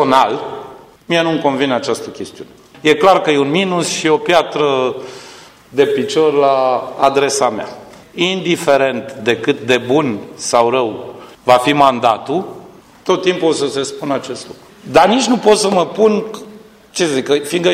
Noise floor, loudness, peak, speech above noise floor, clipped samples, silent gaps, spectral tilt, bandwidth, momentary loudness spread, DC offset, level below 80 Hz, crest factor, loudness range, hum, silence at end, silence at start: -39 dBFS; -14 LUFS; 0 dBFS; 25 dB; under 0.1%; none; -4 dB/octave; 15.5 kHz; 17 LU; under 0.1%; -56 dBFS; 14 dB; 2 LU; none; 0 s; 0 s